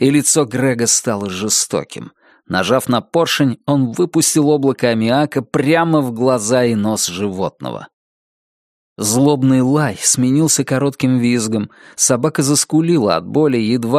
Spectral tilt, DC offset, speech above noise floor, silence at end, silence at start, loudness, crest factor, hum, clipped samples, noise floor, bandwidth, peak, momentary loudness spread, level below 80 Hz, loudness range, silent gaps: -4.5 dB/octave; under 0.1%; over 75 dB; 0 s; 0 s; -15 LUFS; 16 dB; none; under 0.1%; under -90 dBFS; 15.5 kHz; 0 dBFS; 8 LU; -56 dBFS; 3 LU; 7.93-8.96 s